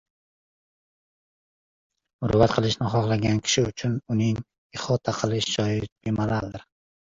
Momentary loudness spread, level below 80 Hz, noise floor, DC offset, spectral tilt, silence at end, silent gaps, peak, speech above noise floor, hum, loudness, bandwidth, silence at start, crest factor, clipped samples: 11 LU; -48 dBFS; under -90 dBFS; under 0.1%; -5.5 dB/octave; 0.5 s; 4.58-4.70 s, 5.92-5.96 s; -4 dBFS; over 66 dB; none; -25 LUFS; 7.8 kHz; 2.2 s; 22 dB; under 0.1%